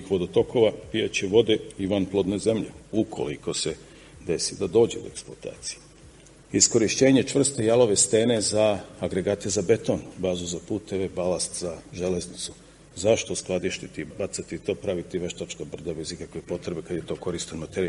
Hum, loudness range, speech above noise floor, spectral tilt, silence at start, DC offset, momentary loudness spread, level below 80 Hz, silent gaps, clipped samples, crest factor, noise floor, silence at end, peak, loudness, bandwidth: none; 10 LU; 25 dB; -4 dB/octave; 0 s; under 0.1%; 15 LU; -54 dBFS; none; under 0.1%; 22 dB; -50 dBFS; 0 s; -4 dBFS; -25 LUFS; 11.5 kHz